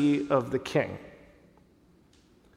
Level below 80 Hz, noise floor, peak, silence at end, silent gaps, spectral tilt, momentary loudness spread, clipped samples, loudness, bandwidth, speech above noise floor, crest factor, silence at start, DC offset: -62 dBFS; -61 dBFS; -10 dBFS; 1.4 s; none; -6.5 dB/octave; 19 LU; under 0.1%; -28 LUFS; 12 kHz; 34 dB; 20 dB; 0 s; under 0.1%